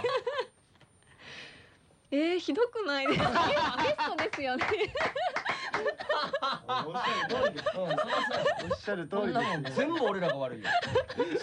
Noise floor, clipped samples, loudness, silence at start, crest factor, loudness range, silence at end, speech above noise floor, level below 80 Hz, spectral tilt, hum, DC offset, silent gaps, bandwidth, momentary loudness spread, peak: -62 dBFS; under 0.1%; -31 LUFS; 0 s; 16 dB; 2 LU; 0 s; 32 dB; -62 dBFS; -5 dB/octave; none; under 0.1%; none; 10 kHz; 6 LU; -14 dBFS